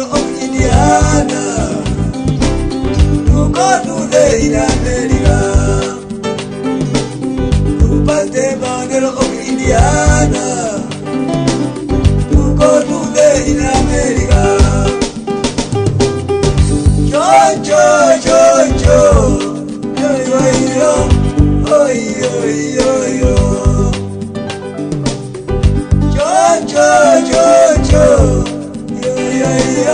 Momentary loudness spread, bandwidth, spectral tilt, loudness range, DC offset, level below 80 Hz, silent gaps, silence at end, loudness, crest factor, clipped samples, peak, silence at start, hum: 10 LU; 10 kHz; -5.5 dB/octave; 5 LU; under 0.1%; -18 dBFS; none; 0 s; -12 LUFS; 10 dB; under 0.1%; 0 dBFS; 0 s; none